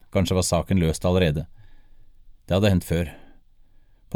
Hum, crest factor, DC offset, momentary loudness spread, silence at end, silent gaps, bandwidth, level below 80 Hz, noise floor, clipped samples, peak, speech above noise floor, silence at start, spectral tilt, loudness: none; 18 dB; under 0.1%; 9 LU; 0 s; none; 18 kHz; -40 dBFS; -52 dBFS; under 0.1%; -6 dBFS; 31 dB; 0.15 s; -5.5 dB/octave; -23 LUFS